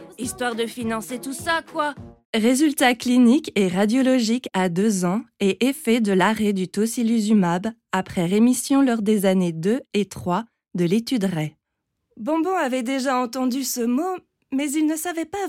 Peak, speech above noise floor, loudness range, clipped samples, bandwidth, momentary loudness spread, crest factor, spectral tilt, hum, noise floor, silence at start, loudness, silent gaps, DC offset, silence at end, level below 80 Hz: -6 dBFS; 57 dB; 5 LU; under 0.1%; 16.5 kHz; 9 LU; 16 dB; -5 dB/octave; none; -78 dBFS; 0 s; -22 LUFS; 2.25-2.33 s; under 0.1%; 0 s; -60 dBFS